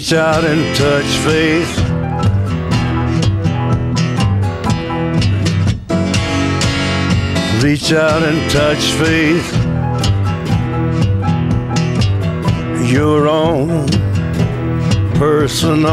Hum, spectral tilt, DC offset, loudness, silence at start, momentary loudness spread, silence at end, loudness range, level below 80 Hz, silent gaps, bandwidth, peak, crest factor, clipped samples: none; -5.5 dB/octave; under 0.1%; -14 LUFS; 0 s; 4 LU; 0 s; 2 LU; -32 dBFS; none; 14 kHz; -2 dBFS; 10 dB; under 0.1%